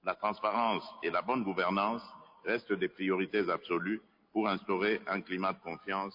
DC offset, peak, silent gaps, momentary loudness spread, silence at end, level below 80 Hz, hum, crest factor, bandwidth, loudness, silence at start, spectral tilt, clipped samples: under 0.1%; -16 dBFS; none; 7 LU; 0 s; -74 dBFS; none; 18 dB; 5.4 kHz; -33 LUFS; 0.05 s; -8 dB/octave; under 0.1%